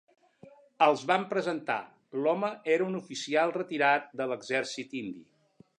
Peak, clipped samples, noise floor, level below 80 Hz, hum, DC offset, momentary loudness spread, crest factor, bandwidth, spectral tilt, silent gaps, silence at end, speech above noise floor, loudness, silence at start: -8 dBFS; under 0.1%; -56 dBFS; -82 dBFS; none; under 0.1%; 12 LU; 22 dB; 10.5 kHz; -4.5 dB/octave; none; 0.6 s; 27 dB; -29 LUFS; 0.45 s